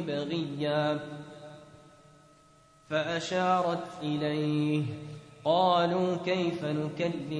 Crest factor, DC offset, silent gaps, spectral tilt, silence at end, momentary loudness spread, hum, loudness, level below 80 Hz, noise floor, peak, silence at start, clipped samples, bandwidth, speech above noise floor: 18 dB; under 0.1%; none; -6.5 dB/octave; 0 s; 17 LU; none; -30 LUFS; -70 dBFS; -60 dBFS; -12 dBFS; 0 s; under 0.1%; 10.5 kHz; 31 dB